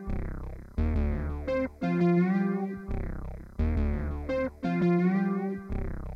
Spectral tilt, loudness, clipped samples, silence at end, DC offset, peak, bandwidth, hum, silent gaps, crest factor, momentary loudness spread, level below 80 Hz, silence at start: -9.5 dB/octave; -30 LUFS; under 0.1%; 0 s; under 0.1%; -16 dBFS; 6 kHz; none; none; 12 dB; 12 LU; -34 dBFS; 0 s